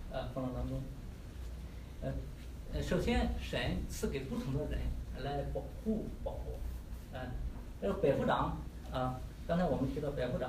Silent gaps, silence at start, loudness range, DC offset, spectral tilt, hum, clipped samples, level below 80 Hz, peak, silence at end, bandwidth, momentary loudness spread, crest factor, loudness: none; 0 s; 4 LU; under 0.1%; -6.5 dB/octave; none; under 0.1%; -44 dBFS; -18 dBFS; 0 s; 15.5 kHz; 14 LU; 20 dB; -38 LUFS